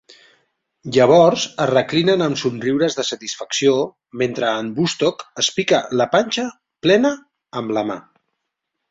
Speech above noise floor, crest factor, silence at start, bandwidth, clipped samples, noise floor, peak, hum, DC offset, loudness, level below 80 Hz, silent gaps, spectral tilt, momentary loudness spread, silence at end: 60 dB; 18 dB; 0.85 s; 7.8 kHz; under 0.1%; -78 dBFS; 0 dBFS; none; under 0.1%; -18 LUFS; -60 dBFS; none; -4.5 dB/octave; 12 LU; 0.9 s